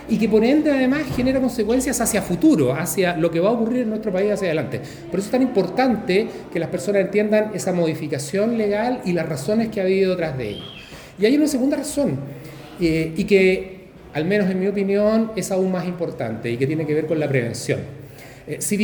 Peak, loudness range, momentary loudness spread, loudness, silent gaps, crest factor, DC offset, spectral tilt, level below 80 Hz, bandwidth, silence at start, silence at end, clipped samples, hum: -4 dBFS; 3 LU; 11 LU; -20 LUFS; none; 18 dB; under 0.1%; -5.5 dB/octave; -48 dBFS; over 20 kHz; 0 s; 0 s; under 0.1%; none